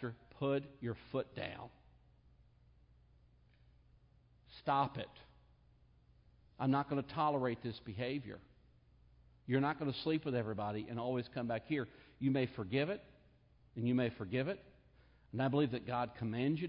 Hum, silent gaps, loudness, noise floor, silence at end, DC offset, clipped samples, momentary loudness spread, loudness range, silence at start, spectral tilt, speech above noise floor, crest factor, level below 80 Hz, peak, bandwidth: none; none; -39 LUFS; -68 dBFS; 0 s; under 0.1%; under 0.1%; 12 LU; 6 LU; 0 s; -5.5 dB/octave; 30 dB; 20 dB; -68 dBFS; -20 dBFS; 5.2 kHz